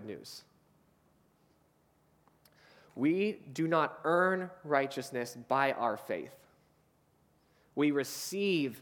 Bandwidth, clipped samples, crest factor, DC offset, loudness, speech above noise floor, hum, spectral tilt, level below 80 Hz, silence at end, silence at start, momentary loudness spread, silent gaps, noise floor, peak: 19 kHz; under 0.1%; 22 dB; under 0.1%; -32 LUFS; 38 dB; none; -5 dB/octave; -80 dBFS; 0 s; 0 s; 15 LU; none; -70 dBFS; -12 dBFS